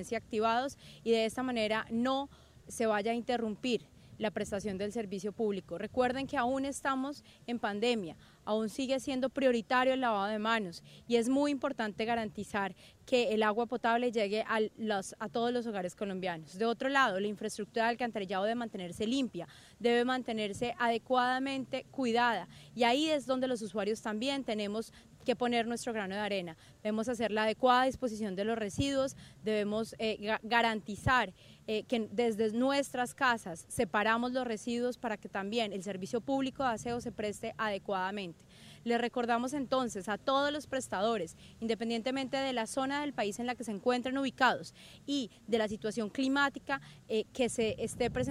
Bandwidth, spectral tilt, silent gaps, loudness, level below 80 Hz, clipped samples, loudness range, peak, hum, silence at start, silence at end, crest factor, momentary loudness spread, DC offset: 15.5 kHz; -4.5 dB/octave; none; -33 LUFS; -64 dBFS; under 0.1%; 3 LU; -12 dBFS; none; 0 s; 0 s; 22 dB; 9 LU; under 0.1%